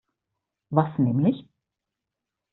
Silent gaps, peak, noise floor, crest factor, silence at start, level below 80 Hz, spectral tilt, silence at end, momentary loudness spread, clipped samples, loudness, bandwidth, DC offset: none; -6 dBFS; -86 dBFS; 22 dB; 0.7 s; -64 dBFS; -9.5 dB/octave; 1.1 s; 5 LU; under 0.1%; -24 LUFS; 4.1 kHz; under 0.1%